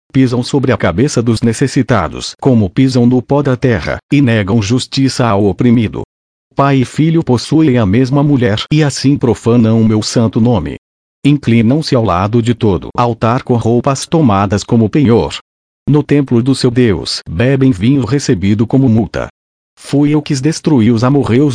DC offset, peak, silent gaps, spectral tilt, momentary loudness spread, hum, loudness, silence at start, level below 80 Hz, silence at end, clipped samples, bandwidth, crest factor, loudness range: under 0.1%; 0 dBFS; 4.03-4.09 s, 6.05-6.51 s, 10.78-11.22 s, 15.41-15.86 s, 19.30-19.77 s; -6.5 dB/octave; 4 LU; none; -12 LUFS; 0.15 s; -38 dBFS; 0 s; under 0.1%; 10.5 kHz; 10 dB; 2 LU